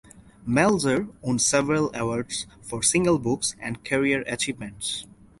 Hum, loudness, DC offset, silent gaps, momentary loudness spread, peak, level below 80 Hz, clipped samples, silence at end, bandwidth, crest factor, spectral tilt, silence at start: none; -24 LUFS; under 0.1%; none; 11 LU; -6 dBFS; -52 dBFS; under 0.1%; 0.35 s; 12 kHz; 20 dB; -3.5 dB/octave; 0.15 s